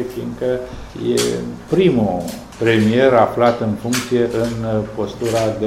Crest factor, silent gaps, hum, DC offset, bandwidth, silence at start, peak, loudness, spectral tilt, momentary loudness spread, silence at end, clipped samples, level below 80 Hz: 18 dB; none; none; under 0.1%; 16 kHz; 0 s; 0 dBFS; -18 LUFS; -5.5 dB/octave; 12 LU; 0 s; under 0.1%; -42 dBFS